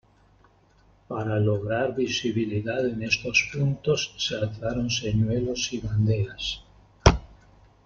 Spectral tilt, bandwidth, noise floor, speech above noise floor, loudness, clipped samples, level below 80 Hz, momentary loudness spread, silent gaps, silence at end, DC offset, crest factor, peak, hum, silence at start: -5 dB/octave; 7.6 kHz; -59 dBFS; 33 dB; -26 LUFS; under 0.1%; -38 dBFS; 7 LU; none; 0.55 s; under 0.1%; 24 dB; -2 dBFS; none; 1.1 s